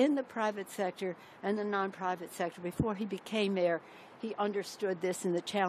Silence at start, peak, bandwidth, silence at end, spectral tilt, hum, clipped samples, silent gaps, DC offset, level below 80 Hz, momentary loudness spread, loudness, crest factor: 0 s; -16 dBFS; 14 kHz; 0 s; -5 dB/octave; none; under 0.1%; none; under 0.1%; -64 dBFS; 8 LU; -35 LUFS; 18 dB